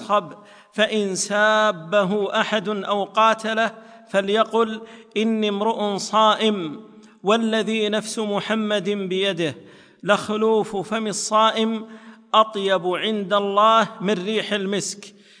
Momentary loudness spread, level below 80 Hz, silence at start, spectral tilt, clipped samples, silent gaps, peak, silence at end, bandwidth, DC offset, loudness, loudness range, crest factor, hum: 9 LU; -72 dBFS; 0 s; -3.5 dB/octave; under 0.1%; none; -4 dBFS; 0.3 s; 10.5 kHz; under 0.1%; -21 LUFS; 3 LU; 18 dB; none